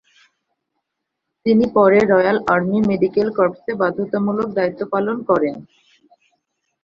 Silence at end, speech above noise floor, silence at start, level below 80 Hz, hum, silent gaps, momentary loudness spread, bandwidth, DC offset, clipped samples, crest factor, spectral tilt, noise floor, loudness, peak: 1.2 s; 61 dB; 1.45 s; -56 dBFS; none; none; 8 LU; 7.2 kHz; under 0.1%; under 0.1%; 18 dB; -8 dB/octave; -78 dBFS; -18 LUFS; -2 dBFS